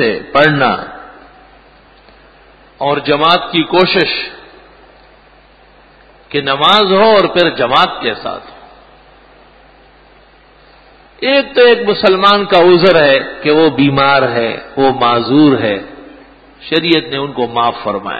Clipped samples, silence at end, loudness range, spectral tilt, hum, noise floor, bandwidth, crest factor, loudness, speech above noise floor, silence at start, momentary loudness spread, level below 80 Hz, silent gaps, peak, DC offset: under 0.1%; 0 s; 7 LU; -6.5 dB/octave; none; -44 dBFS; 8 kHz; 14 dB; -11 LUFS; 33 dB; 0 s; 12 LU; -48 dBFS; none; 0 dBFS; under 0.1%